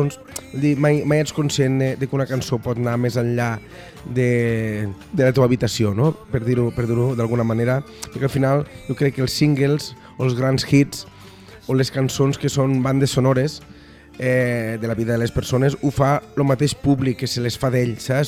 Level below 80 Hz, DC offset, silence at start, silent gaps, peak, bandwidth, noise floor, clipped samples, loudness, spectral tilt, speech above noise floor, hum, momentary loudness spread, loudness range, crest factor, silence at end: -46 dBFS; under 0.1%; 0 s; none; -4 dBFS; 15 kHz; -42 dBFS; under 0.1%; -20 LUFS; -6.5 dB/octave; 23 dB; none; 8 LU; 2 LU; 16 dB; 0 s